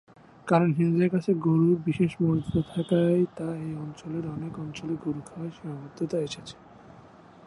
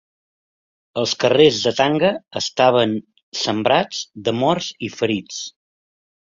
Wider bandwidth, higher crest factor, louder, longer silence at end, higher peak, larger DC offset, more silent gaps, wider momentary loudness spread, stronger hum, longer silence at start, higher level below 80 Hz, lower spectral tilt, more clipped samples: first, 11 kHz vs 7.6 kHz; about the same, 18 dB vs 18 dB; second, -27 LUFS vs -19 LUFS; second, 0.45 s vs 0.85 s; second, -10 dBFS vs -2 dBFS; neither; second, none vs 3.23-3.32 s; about the same, 14 LU vs 14 LU; neither; second, 0.45 s vs 0.95 s; about the same, -58 dBFS vs -60 dBFS; first, -8 dB/octave vs -4 dB/octave; neither